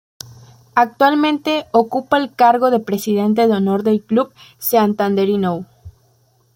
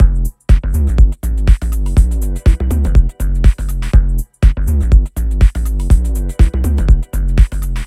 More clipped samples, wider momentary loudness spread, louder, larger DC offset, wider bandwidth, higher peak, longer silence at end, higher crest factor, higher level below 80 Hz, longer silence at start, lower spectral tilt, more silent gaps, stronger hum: second, under 0.1% vs 0.2%; first, 9 LU vs 4 LU; about the same, -16 LUFS vs -15 LUFS; neither; first, 17 kHz vs 13.5 kHz; about the same, -2 dBFS vs 0 dBFS; first, 0.65 s vs 0 s; first, 16 dB vs 10 dB; second, -58 dBFS vs -12 dBFS; first, 0.75 s vs 0 s; second, -5.5 dB/octave vs -7 dB/octave; neither; neither